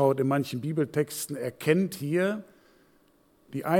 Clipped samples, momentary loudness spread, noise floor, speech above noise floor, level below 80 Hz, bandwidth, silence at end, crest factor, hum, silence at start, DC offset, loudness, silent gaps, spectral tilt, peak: under 0.1%; 9 LU; -63 dBFS; 36 dB; -74 dBFS; 18.5 kHz; 0 s; 20 dB; none; 0 s; under 0.1%; -28 LUFS; none; -6 dB/octave; -8 dBFS